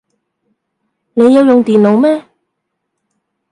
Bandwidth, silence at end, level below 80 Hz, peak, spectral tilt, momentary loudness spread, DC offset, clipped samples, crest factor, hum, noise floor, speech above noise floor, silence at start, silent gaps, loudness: 11 kHz; 1.3 s; -62 dBFS; 0 dBFS; -7.5 dB/octave; 10 LU; under 0.1%; under 0.1%; 12 dB; none; -72 dBFS; 64 dB; 1.15 s; none; -10 LUFS